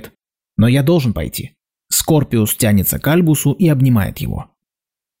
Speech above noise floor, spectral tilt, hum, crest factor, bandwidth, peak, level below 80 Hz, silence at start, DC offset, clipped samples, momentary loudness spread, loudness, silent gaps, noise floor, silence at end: 74 dB; -5.5 dB/octave; none; 12 dB; 16.5 kHz; -4 dBFS; -38 dBFS; 0 s; under 0.1%; under 0.1%; 12 LU; -15 LUFS; none; -88 dBFS; 0.75 s